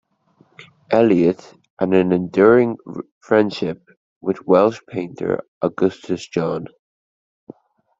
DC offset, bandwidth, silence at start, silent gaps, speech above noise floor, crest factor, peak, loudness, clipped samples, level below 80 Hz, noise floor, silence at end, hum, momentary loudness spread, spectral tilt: under 0.1%; 7.8 kHz; 0.6 s; 1.70-1.77 s, 3.11-3.21 s, 3.97-4.21 s, 5.48-5.61 s; 40 dB; 18 dB; -2 dBFS; -19 LUFS; under 0.1%; -60 dBFS; -58 dBFS; 1.35 s; none; 15 LU; -7.5 dB/octave